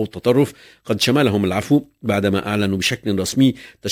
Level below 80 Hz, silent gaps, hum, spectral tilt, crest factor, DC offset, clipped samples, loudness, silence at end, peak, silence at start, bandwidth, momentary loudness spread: -44 dBFS; none; none; -5 dB/octave; 16 dB; under 0.1%; under 0.1%; -19 LUFS; 0 s; -2 dBFS; 0 s; 16 kHz; 6 LU